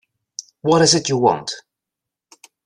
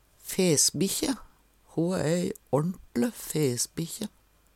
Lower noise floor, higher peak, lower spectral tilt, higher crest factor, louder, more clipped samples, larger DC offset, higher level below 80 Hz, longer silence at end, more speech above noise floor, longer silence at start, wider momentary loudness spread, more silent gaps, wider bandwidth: first, -85 dBFS vs -59 dBFS; first, 0 dBFS vs -10 dBFS; about the same, -3.5 dB/octave vs -4 dB/octave; about the same, 20 dB vs 18 dB; first, -16 LUFS vs -28 LUFS; neither; neither; about the same, -60 dBFS vs -58 dBFS; first, 1.05 s vs 0.5 s; first, 68 dB vs 31 dB; first, 0.4 s vs 0.25 s; first, 21 LU vs 13 LU; neither; second, 11.5 kHz vs 17.5 kHz